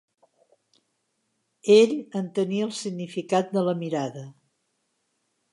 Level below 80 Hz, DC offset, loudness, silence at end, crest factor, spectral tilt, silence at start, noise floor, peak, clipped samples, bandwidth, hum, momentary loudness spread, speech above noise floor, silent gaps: -80 dBFS; under 0.1%; -24 LUFS; 1.2 s; 22 dB; -5.5 dB/octave; 1.65 s; -75 dBFS; -6 dBFS; under 0.1%; 11.5 kHz; none; 15 LU; 52 dB; none